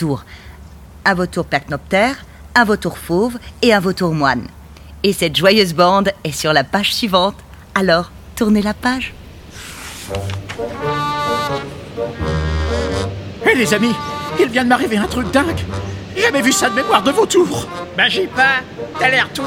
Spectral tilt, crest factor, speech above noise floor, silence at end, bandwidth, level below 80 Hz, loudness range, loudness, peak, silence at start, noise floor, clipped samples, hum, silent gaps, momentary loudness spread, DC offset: -4 dB/octave; 16 dB; 22 dB; 0 s; 17 kHz; -36 dBFS; 6 LU; -16 LUFS; 0 dBFS; 0 s; -37 dBFS; under 0.1%; none; none; 12 LU; under 0.1%